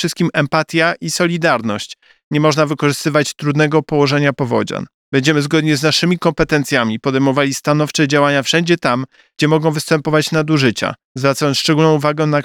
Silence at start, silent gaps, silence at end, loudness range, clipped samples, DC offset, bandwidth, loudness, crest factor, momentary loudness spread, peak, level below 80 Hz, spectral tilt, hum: 0 s; 2.24-2.31 s, 4.94-5.12 s, 11.05-11.15 s; 0 s; 1 LU; under 0.1%; under 0.1%; 16.5 kHz; -15 LUFS; 14 dB; 5 LU; 0 dBFS; -48 dBFS; -5 dB/octave; none